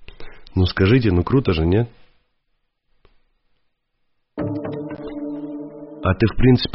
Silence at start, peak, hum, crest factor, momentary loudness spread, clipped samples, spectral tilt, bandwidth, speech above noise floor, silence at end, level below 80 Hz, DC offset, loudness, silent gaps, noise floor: 0 s; -4 dBFS; none; 18 dB; 15 LU; under 0.1%; -6.5 dB/octave; 5.8 kHz; 53 dB; 0 s; -34 dBFS; under 0.1%; -20 LUFS; none; -69 dBFS